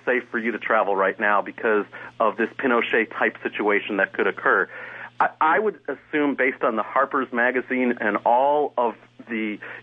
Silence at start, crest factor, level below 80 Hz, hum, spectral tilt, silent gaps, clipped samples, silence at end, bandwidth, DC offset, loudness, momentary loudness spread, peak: 0.05 s; 18 dB; -74 dBFS; none; -7 dB/octave; none; under 0.1%; 0 s; 5 kHz; under 0.1%; -22 LUFS; 8 LU; -6 dBFS